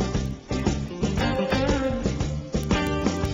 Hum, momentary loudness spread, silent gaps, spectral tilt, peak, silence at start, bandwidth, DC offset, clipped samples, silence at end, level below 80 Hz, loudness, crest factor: none; 6 LU; none; -6 dB/octave; -6 dBFS; 0 s; 16 kHz; under 0.1%; under 0.1%; 0 s; -34 dBFS; -26 LUFS; 18 dB